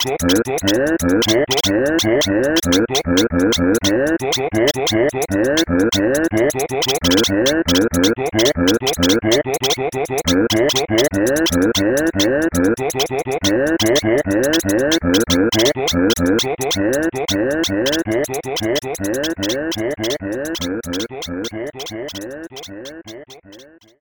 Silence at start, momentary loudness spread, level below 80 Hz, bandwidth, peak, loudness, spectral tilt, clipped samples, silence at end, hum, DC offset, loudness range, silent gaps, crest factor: 0 s; 9 LU; -40 dBFS; over 20 kHz; 0 dBFS; -17 LUFS; -3.5 dB/octave; under 0.1%; 0.35 s; none; under 0.1%; 7 LU; none; 16 dB